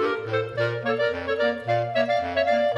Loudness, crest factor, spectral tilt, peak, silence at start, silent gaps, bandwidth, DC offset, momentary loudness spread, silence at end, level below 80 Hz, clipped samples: -24 LUFS; 14 dB; -6.5 dB/octave; -10 dBFS; 0 s; none; 11 kHz; under 0.1%; 3 LU; 0 s; -58 dBFS; under 0.1%